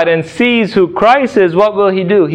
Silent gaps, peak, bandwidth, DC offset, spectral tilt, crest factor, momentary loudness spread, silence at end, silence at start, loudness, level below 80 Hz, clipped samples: none; 0 dBFS; 9.6 kHz; under 0.1%; -6.5 dB/octave; 10 dB; 3 LU; 0 s; 0 s; -11 LUFS; -48 dBFS; under 0.1%